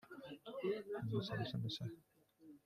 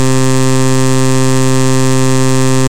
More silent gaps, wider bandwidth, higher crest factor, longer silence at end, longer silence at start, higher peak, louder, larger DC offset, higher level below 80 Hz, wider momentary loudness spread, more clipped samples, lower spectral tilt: neither; second, 14.5 kHz vs 16.5 kHz; first, 18 dB vs 12 dB; about the same, 0.05 s vs 0 s; about the same, 0.05 s vs 0 s; second, -28 dBFS vs 0 dBFS; second, -44 LUFS vs -11 LUFS; second, under 0.1% vs 20%; second, -76 dBFS vs -50 dBFS; first, 13 LU vs 0 LU; neither; first, -7 dB/octave vs -5 dB/octave